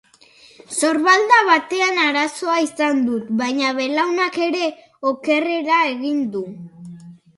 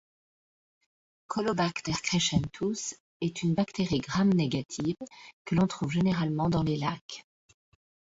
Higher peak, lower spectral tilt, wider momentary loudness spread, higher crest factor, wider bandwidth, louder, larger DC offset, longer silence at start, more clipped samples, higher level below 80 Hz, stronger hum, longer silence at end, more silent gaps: first, 0 dBFS vs -14 dBFS; second, -3 dB/octave vs -5.5 dB/octave; about the same, 13 LU vs 12 LU; about the same, 18 dB vs 18 dB; first, 11.5 kHz vs 8 kHz; first, -18 LUFS vs -29 LUFS; neither; second, 0.7 s vs 1.3 s; neither; second, -70 dBFS vs -56 dBFS; neither; second, 0.25 s vs 0.85 s; second, none vs 3.00-3.20 s, 5.33-5.45 s, 7.01-7.09 s